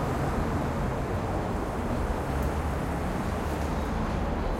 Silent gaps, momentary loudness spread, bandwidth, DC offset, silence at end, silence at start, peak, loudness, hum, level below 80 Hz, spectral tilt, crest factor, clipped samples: none; 2 LU; 16.5 kHz; under 0.1%; 0 s; 0 s; -16 dBFS; -30 LUFS; none; -34 dBFS; -7 dB/octave; 12 dB; under 0.1%